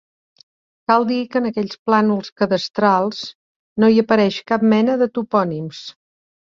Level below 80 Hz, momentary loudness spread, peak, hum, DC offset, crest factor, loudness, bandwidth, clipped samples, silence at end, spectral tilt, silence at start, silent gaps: -62 dBFS; 15 LU; -2 dBFS; none; under 0.1%; 16 dB; -18 LUFS; 7.2 kHz; under 0.1%; 0.6 s; -6.5 dB/octave; 0.9 s; 1.79-1.86 s, 2.32-2.36 s, 3.35-3.76 s